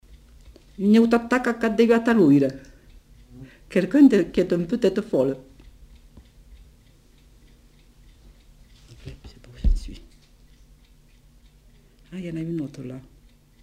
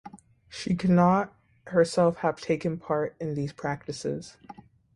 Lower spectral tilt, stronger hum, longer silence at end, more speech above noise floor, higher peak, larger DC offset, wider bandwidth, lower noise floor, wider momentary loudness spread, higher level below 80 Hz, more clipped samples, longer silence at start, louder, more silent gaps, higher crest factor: about the same, -7.5 dB/octave vs -7 dB/octave; neither; first, 0.65 s vs 0.45 s; first, 34 dB vs 23 dB; about the same, -6 dBFS vs -8 dBFS; neither; first, 13 kHz vs 11.5 kHz; first, -54 dBFS vs -49 dBFS; first, 25 LU vs 16 LU; first, -38 dBFS vs -60 dBFS; neither; first, 0.8 s vs 0.05 s; first, -21 LUFS vs -27 LUFS; neither; about the same, 20 dB vs 20 dB